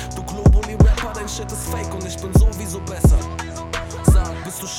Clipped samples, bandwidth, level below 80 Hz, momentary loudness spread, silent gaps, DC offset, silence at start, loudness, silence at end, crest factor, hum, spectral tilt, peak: under 0.1%; 16.5 kHz; -20 dBFS; 11 LU; none; under 0.1%; 0 s; -20 LUFS; 0 s; 14 dB; none; -6 dB/octave; -4 dBFS